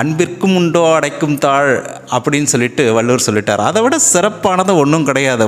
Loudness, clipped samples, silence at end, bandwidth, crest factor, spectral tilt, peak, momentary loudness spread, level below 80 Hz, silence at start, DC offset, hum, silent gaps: -13 LUFS; under 0.1%; 0 s; 16 kHz; 12 dB; -4 dB/octave; 0 dBFS; 5 LU; -52 dBFS; 0 s; under 0.1%; none; none